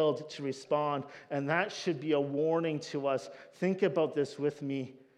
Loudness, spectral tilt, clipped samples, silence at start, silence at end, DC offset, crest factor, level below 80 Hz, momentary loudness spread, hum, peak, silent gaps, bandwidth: -33 LUFS; -6 dB/octave; under 0.1%; 0 s; 0.2 s; under 0.1%; 18 dB; -90 dBFS; 9 LU; none; -14 dBFS; none; 10.5 kHz